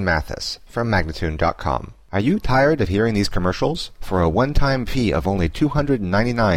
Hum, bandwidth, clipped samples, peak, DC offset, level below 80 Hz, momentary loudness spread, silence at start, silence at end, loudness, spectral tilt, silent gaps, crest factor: none; 15.5 kHz; under 0.1%; -6 dBFS; under 0.1%; -30 dBFS; 8 LU; 0 s; 0 s; -21 LUFS; -6.5 dB/octave; none; 14 dB